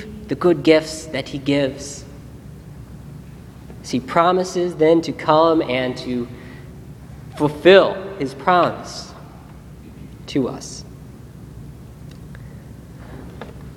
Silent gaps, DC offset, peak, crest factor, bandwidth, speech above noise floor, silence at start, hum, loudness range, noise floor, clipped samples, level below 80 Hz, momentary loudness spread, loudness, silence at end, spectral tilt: none; under 0.1%; 0 dBFS; 20 dB; 14.5 kHz; 21 dB; 0 s; none; 13 LU; -39 dBFS; under 0.1%; -44 dBFS; 24 LU; -18 LUFS; 0 s; -5.5 dB/octave